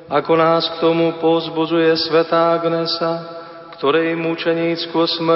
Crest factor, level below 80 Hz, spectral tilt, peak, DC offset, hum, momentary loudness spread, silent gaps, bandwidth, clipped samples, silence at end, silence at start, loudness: 16 dB; -62 dBFS; -9 dB/octave; -2 dBFS; under 0.1%; none; 7 LU; none; 5.8 kHz; under 0.1%; 0 s; 0 s; -17 LUFS